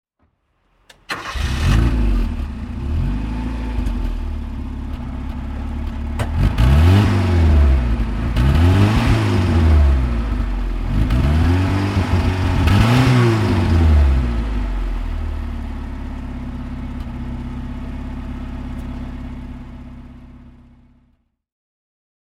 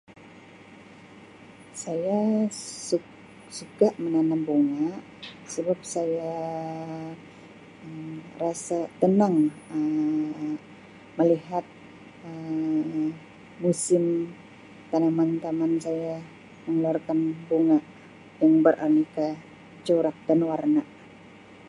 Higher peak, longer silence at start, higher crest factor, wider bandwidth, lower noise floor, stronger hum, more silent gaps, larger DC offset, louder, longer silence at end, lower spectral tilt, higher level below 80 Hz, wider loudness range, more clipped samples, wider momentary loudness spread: first, 0 dBFS vs -6 dBFS; first, 1.1 s vs 0.2 s; second, 16 dB vs 22 dB; about the same, 12.5 kHz vs 11.5 kHz; first, -64 dBFS vs -49 dBFS; neither; neither; neither; first, -19 LUFS vs -26 LUFS; first, 1.85 s vs 0 s; about the same, -7 dB/octave vs -6.5 dB/octave; first, -20 dBFS vs -70 dBFS; first, 15 LU vs 7 LU; neither; about the same, 16 LU vs 18 LU